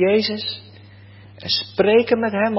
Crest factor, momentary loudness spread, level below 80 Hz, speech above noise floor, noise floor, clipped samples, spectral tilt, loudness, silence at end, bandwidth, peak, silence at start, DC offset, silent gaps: 16 dB; 14 LU; -54 dBFS; 25 dB; -43 dBFS; under 0.1%; -8.5 dB/octave; -19 LUFS; 0 s; 5.8 kHz; -4 dBFS; 0 s; under 0.1%; none